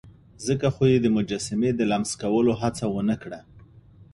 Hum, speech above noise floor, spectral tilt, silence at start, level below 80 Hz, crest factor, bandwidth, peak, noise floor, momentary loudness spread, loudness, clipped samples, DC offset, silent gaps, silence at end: none; 27 dB; -6 dB/octave; 0.05 s; -52 dBFS; 16 dB; 11.5 kHz; -8 dBFS; -50 dBFS; 10 LU; -24 LUFS; under 0.1%; under 0.1%; none; 0.1 s